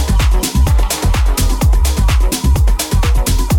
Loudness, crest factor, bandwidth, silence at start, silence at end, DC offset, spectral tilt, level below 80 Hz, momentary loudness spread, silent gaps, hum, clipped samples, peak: -14 LUFS; 8 dB; 18.5 kHz; 0 s; 0 s; under 0.1%; -4.5 dB/octave; -12 dBFS; 1 LU; none; none; under 0.1%; -4 dBFS